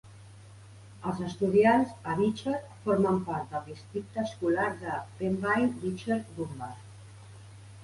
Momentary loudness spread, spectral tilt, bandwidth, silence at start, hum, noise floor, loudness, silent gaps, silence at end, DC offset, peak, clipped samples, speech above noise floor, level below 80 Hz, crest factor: 24 LU; -7 dB/octave; 11.5 kHz; 0.05 s; none; -50 dBFS; -30 LUFS; none; 0 s; under 0.1%; -12 dBFS; under 0.1%; 21 dB; -60 dBFS; 18 dB